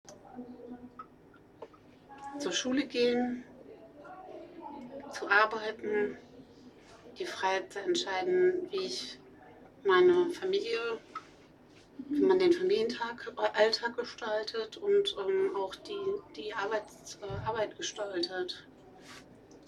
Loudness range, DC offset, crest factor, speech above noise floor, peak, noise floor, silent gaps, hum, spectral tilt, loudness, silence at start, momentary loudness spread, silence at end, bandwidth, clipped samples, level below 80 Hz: 5 LU; under 0.1%; 22 dB; 27 dB; -10 dBFS; -58 dBFS; none; none; -3.5 dB/octave; -31 LUFS; 0.1 s; 24 LU; 0.1 s; 11.5 kHz; under 0.1%; -68 dBFS